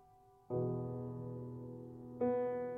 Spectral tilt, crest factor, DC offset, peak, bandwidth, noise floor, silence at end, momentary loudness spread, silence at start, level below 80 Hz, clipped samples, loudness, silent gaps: -11.5 dB/octave; 16 dB; under 0.1%; -26 dBFS; 3.5 kHz; -65 dBFS; 0 s; 13 LU; 0 s; -70 dBFS; under 0.1%; -41 LUFS; none